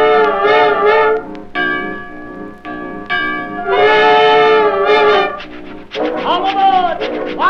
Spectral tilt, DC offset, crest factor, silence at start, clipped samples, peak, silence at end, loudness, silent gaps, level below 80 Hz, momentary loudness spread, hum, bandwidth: -5 dB/octave; under 0.1%; 12 dB; 0 s; under 0.1%; 0 dBFS; 0 s; -12 LUFS; none; -44 dBFS; 19 LU; 60 Hz at -50 dBFS; 6.6 kHz